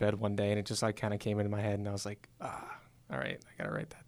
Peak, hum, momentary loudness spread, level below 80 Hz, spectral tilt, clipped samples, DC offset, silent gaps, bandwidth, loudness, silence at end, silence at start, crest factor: -18 dBFS; none; 11 LU; -64 dBFS; -5.5 dB/octave; under 0.1%; under 0.1%; none; 14 kHz; -36 LUFS; 0.05 s; 0 s; 18 dB